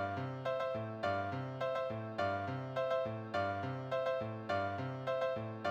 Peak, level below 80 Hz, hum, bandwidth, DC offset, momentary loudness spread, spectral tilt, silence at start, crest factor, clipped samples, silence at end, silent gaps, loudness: -24 dBFS; -72 dBFS; none; 9.2 kHz; under 0.1%; 3 LU; -7 dB/octave; 0 s; 14 dB; under 0.1%; 0 s; none; -38 LUFS